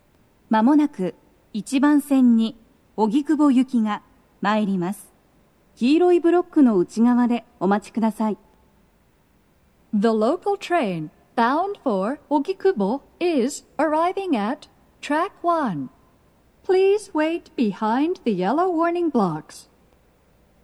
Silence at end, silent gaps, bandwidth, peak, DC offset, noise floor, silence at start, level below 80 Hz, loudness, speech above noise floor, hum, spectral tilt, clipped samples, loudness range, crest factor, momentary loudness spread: 1 s; none; 13 kHz; -6 dBFS; under 0.1%; -60 dBFS; 0.5 s; -64 dBFS; -21 LUFS; 40 dB; none; -6.5 dB/octave; under 0.1%; 5 LU; 16 dB; 11 LU